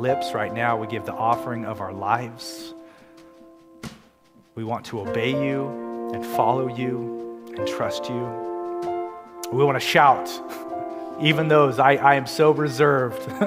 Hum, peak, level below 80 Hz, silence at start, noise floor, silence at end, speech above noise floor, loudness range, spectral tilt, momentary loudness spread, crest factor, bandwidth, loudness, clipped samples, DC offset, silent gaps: none; -2 dBFS; -64 dBFS; 0 s; -56 dBFS; 0 s; 34 dB; 11 LU; -5.5 dB/octave; 17 LU; 22 dB; 16 kHz; -22 LUFS; under 0.1%; under 0.1%; none